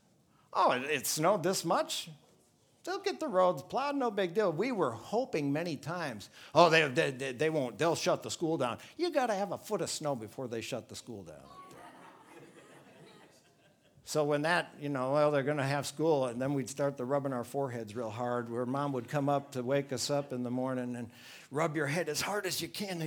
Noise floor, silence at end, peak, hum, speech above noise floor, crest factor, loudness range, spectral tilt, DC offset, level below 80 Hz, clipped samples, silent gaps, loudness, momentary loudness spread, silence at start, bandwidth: -67 dBFS; 0 s; -8 dBFS; none; 35 dB; 26 dB; 9 LU; -4.5 dB/octave; under 0.1%; -78 dBFS; under 0.1%; none; -32 LUFS; 11 LU; 0.55 s; 20 kHz